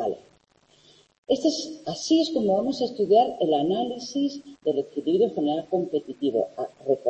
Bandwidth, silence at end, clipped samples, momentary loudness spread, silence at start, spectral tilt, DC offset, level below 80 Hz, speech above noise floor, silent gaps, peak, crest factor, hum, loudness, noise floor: 8.6 kHz; 0 s; under 0.1%; 10 LU; 0 s; -5.5 dB/octave; under 0.1%; -68 dBFS; 37 dB; 1.18-1.23 s; -8 dBFS; 16 dB; none; -25 LUFS; -61 dBFS